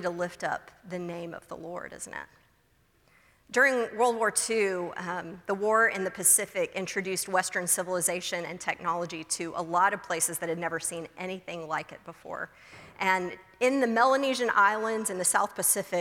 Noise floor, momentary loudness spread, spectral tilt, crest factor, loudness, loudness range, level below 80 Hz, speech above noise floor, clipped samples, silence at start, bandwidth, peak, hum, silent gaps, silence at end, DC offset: -66 dBFS; 15 LU; -2.5 dB/octave; 20 dB; -27 LUFS; 7 LU; -70 dBFS; 37 dB; under 0.1%; 0 s; 18.5 kHz; -8 dBFS; none; none; 0 s; under 0.1%